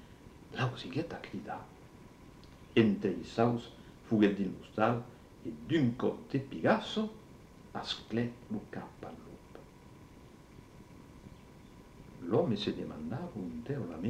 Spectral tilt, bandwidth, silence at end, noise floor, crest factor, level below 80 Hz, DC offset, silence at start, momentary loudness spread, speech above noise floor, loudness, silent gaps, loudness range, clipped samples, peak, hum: -7 dB/octave; 12.5 kHz; 0 s; -55 dBFS; 22 dB; -62 dBFS; under 0.1%; 0 s; 25 LU; 22 dB; -34 LUFS; none; 13 LU; under 0.1%; -14 dBFS; none